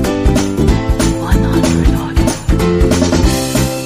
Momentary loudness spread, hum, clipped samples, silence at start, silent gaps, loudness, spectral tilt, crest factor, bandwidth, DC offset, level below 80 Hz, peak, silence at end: 3 LU; none; under 0.1%; 0 s; none; -13 LUFS; -5.5 dB/octave; 12 dB; 15.5 kHz; under 0.1%; -16 dBFS; 0 dBFS; 0 s